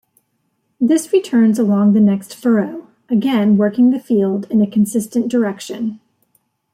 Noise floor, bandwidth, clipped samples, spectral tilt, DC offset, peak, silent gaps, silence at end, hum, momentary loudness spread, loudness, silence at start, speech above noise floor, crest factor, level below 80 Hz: -67 dBFS; 14.5 kHz; under 0.1%; -7 dB/octave; under 0.1%; -4 dBFS; none; 0.75 s; none; 10 LU; -16 LUFS; 0.8 s; 53 dB; 12 dB; -62 dBFS